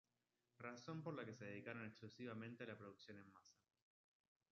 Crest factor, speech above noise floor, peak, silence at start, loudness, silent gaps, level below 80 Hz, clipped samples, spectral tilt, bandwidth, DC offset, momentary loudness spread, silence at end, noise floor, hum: 20 dB; over 35 dB; -38 dBFS; 0.6 s; -55 LUFS; none; -90 dBFS; under 0.1%; -5 dB/octave; 7.2 kHz; under 0.1%; 10 LU; 1 s; under -90 dBFS; none